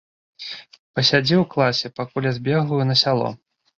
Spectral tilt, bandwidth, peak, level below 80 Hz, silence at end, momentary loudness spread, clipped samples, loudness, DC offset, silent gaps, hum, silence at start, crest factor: -5.5 dB/octave; 7.6 kHz; -2 dBFS; -60 dBFS; 0.45 s; 16 LU; under 0.1%; -20 LUFS; under 0.1%; 0.79-0.94 s; none; 0.4 s; 18 dB